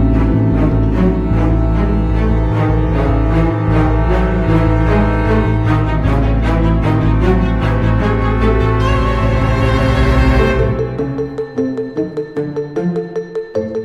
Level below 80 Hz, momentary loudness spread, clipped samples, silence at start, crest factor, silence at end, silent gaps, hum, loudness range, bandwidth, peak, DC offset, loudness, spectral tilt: -18 dBFS; 7 LU; under 0.1%; 0 s; 12 dB; 0 s; none; none; 2 LU; 7 kHz; -2 dBFS; under 0.1%; -15 LUFS; -8.5 dB/octave